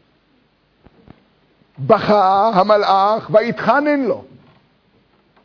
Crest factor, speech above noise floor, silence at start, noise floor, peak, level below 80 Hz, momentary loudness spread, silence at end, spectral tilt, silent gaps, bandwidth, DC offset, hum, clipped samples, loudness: 18 dB; 44 dB; 1.8 s; -59 dBFS; 0 dBFS; -58 dBFS; 7 LU; 1.25 s; -7 dB/octave; none; 5.4 kHz; under 0.1%; none; under 0.1%; -15 LUFS